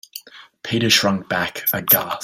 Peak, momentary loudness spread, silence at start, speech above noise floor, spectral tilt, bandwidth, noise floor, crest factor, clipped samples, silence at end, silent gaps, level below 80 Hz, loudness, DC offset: 0 dBFS; 20 LU; 0.15 s; 22 dB; -3 dB/octave; 16.5 kHz; -41 dBFS; 20 dB; under 0.1%; 0 s; none; -58 dBFS; -17 LUFS; under 0.1%